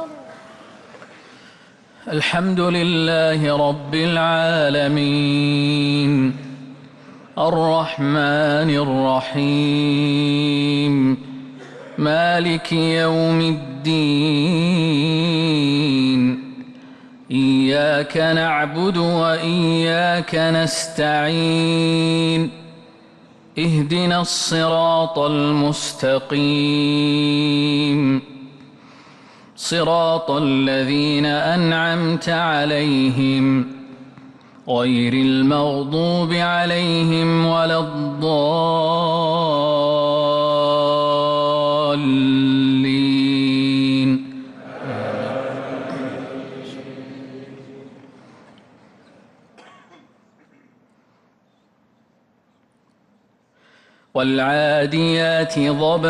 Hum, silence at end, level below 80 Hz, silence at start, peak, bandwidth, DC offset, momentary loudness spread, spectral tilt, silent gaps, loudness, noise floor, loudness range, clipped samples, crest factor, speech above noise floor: none; 0 s; -58 dBFS; 0 s; -8 dBFS; 12 kHz; under 0.1%; 11 LU; -5.5 dB/octave; none; -18 LUFS; -61 dBFS; 4 LU; under 0.1%; 12 dB; 43 dB